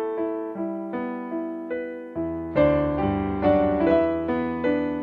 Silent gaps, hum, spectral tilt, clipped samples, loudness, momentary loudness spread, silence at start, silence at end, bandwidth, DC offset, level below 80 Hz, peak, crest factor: none; none; -10 dB/octave; under 0.1%; -25 LUFS; 10 LU; 0 s; 0 s; 5.2 kHz; under 0.1%; -44 dBFS; -6 dBFS; 18 dB